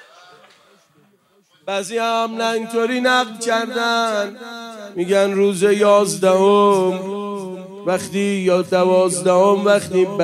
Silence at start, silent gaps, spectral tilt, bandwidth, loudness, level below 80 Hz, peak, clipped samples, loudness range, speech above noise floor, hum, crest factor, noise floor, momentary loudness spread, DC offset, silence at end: 1.65 s; none; -4.5 dB/octave; 14 kHz; -17 LUFS; -70 dBFS; -2 dBFS; under 0.1%; 4 LU; 41 dB; none; 16 dB; -58 dBFS; 13 LU; under 0.1%; 0 s